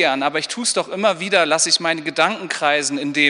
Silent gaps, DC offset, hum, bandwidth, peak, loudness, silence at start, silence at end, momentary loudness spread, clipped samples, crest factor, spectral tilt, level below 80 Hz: none; under 0.1%; none; 11 kHz; -2 dBFS; -18 LUFS; 0 s; 0 s; 6 LU; under 0.1%; 16 dB; -1.5 dB/octave; -68 dBFS